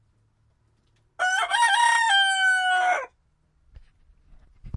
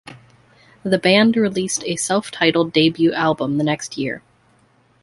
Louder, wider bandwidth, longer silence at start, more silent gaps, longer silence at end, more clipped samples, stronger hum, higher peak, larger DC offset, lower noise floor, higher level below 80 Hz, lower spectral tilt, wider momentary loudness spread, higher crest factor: second, -21 LUFS vs -18 LUFS; about the same, 11.5 kHz vs 11.5 kHz; first, 1.2 s vs 0.05 s; neither; second, 0 s vs 0.85 s; neither; neither; second, -8 dBFS vs -2 dBFS; neither; first, -66 dBFS vs -57 dBFS; about the same, -56 dBFS vs -58 dBFS; second, 0.5 dB/octave vs -4 dB/octave; about the same, 9 LU vs 11 LU; about the same, 16 dB vs 18 dB